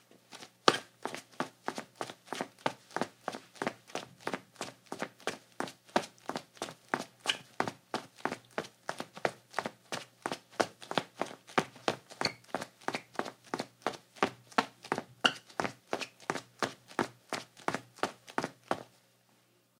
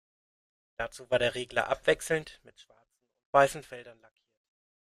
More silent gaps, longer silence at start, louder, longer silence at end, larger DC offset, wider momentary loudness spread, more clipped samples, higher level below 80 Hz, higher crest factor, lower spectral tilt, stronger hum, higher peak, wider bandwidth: second, none vs 3.25-3.33 s; second, 0.3 s vs 0.8 s; second, -37 LUFS vs -29 LUFS; about the same, 0.95 s vs 1.05 s; neither; second, 10 LU vs 22 LU; neither; second, -80 dBFS vs -60 dBFS; first, 36 dB vs 26 dB; about the same, -3 dB/octave vs -3.5 dB/octave; neither; first, -2 dBFS vs -8 dBFS; first, 17 kHz vs 14.5 kHz